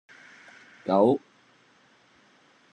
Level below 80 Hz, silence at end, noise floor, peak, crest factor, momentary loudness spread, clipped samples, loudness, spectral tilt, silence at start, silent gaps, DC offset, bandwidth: -84 dBFS; 1.55 s; -61 dBFS; -8 dBFS; 22 dB; 27 LU; under 0.1%; -25 LUFS; -8 dB/octave; 0.85 s; none; under 0.1%; 10 kHz